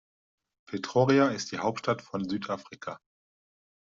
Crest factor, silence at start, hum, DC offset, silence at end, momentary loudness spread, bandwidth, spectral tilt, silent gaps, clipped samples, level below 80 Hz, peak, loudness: 20 dB; 0.7 s; none; under 0.1%; 0.95 s; 18 LU; 7.8 kHz; -5.5 dB/octave; none; under 0.1%; -70 dBFS; -10 dBFS; -28 LUFS